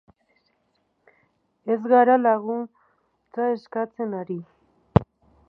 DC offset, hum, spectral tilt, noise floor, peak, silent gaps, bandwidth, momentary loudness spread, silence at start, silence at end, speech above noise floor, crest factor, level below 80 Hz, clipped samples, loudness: under 0.1%; none; -10.5 dB/octave; -70 dBFS; 0 dBFS; none; 5.4 kHz; 18 LU; 1.65 s; 0.45 s; 48 dB; 24 dB; -48 dBFS; under 0.1%; -23 LUFS